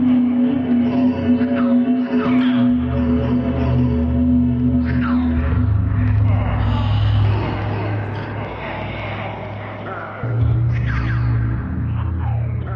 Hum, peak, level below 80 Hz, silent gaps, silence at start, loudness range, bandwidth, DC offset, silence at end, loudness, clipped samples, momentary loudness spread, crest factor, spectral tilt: none; -8 dBFS; -28 dBFS; none; 0 s; 6 LU; 5.6 kHz; under 0.1%; 0 s; -19 LUFS; under 0.1%; 10 LU; 10 dB; -10.5 dB/octave